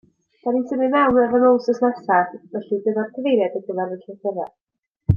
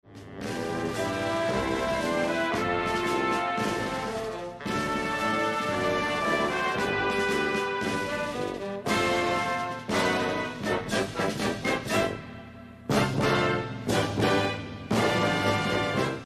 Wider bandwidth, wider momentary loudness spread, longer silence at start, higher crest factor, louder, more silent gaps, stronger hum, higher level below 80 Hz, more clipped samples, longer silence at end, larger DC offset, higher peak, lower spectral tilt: second, 6.8 kHz vs 13.5 kHz; first, 13 LU vs 8 LU; first, 0.45 s vs 0.05 s; about the same, 18 dB vs 16 dB; first, -20 LUFS vs -27 LUFS; first, 4.61-4.67 s, 4.79-4.83 s vs none; neither; about the same, -52 dBFS vs -52 dBFS; neither; about the same, 0 s vs 0 s; neither; first, -2 dBFS vs -12 dBFS; first, -8.5 dB/octave vs -4.5 dB/octave